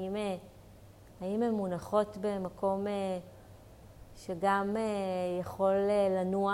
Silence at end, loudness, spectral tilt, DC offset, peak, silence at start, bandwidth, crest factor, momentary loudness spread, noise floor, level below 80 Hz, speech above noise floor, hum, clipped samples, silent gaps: 0 s; -33 LUFS; -6.5 dB/octave; under 0.1%; -16 dBFS; 0 s; 16 kHz; 18 dB; 12 LU; -54 dBFS; -60 dBFS; 23 dB; none; under 0.1%; none